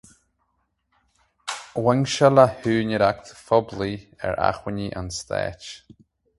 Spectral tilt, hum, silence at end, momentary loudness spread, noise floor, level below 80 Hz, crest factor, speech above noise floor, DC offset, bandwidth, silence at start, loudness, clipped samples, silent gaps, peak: -5.5 dB/octave; none; 0.6 s; 16 LU; -72 dBFS; -50 dBFS; 24 dB; 50 dB; under 0.1%; 11.5 kHz; 1.45 s; -22 LUFS; under 0.1%; none; 0 dBFS